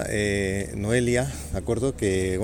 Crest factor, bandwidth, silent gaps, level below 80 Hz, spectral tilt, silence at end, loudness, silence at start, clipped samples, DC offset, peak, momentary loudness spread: 16 dB; 19 kHz; none; -38 dBFS; -5.5 dB/octave; 0 s; -25 LUFS; 0 s; under 0.1%; under 0.1%; -8 dBFS; 6 LU